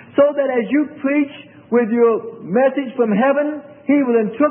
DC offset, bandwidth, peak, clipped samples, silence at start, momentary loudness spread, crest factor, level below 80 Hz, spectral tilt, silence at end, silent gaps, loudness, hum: under 0.1%; 3.5 kHz; -2 dBFS; under 0.1%; 0.15 s; 6 LU; 14 dB; -70 dBFS; -12 dB/octave; 0 s; none; -17 LUFS; none